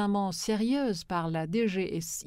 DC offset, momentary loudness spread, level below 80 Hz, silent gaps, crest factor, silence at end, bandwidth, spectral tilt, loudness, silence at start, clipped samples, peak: under 0.1%; 4 LU; -58 dBFS; none; 12 dB; 0.05 s; 16 kHz; -5 dB/octave; -30 LUFS; 0 s; under 0.1%; -18 dBFS